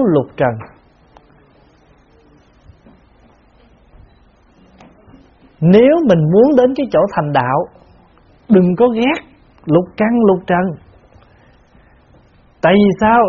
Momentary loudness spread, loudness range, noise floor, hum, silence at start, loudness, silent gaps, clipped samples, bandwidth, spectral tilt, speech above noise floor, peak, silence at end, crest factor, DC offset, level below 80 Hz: 10 LU; 5 LU; -49 dBFS; none; 0 s; -13 LUFS; none; under 0.1%; 6.8 kHz; -6.5 dB/octave; 38 dB; 0 dBFS; 0 s; 16 dB; under 0.1%; -48 dBFS